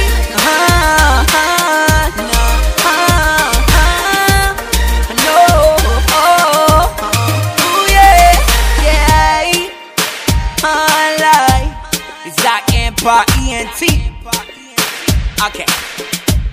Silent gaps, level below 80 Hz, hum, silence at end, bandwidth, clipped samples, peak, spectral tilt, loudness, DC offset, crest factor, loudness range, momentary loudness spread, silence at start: none; -16 dBFS; none; 0 s; 16.5 kHz; 0.6%; 0 dBFS; -3.5 dB/octave; -11 LUFS; under 0.1%; 10 dB; 5 LU; 8 LU; 0 s